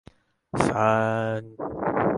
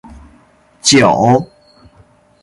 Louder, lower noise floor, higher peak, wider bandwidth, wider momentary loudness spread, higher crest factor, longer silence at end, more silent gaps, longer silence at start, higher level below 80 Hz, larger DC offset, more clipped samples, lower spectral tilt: second, -25 LUFS vs -11 LUFS; about the same, -48 dBFS vs -49 dBFS; about the same, -2 dBFS vs 0 dBFS; about the same, 11.5 kHz vs 11.5 kHz; first, 12 LU vs 8 LU; first, 24 dB vs 16 dB; second, 0 s vs 0.95 s; neither; second, 0.55 s vs 0.85 s; second, -52 dBFS vs -46 dBFS; neither; neither; first, -6.5 dB/octave vs -4 dB/octave